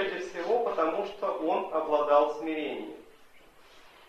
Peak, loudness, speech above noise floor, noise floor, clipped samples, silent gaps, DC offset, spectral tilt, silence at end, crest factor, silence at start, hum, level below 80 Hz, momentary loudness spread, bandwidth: -10 dBFS; -29 LUFS; 27 dB; -55 dBFS; under 0.1%; none; under 0.1%; -4.5 dB/octave; 0.2 s; 20 dB; 0 s; none; -70 dBFS; 12 LU; 13 kHz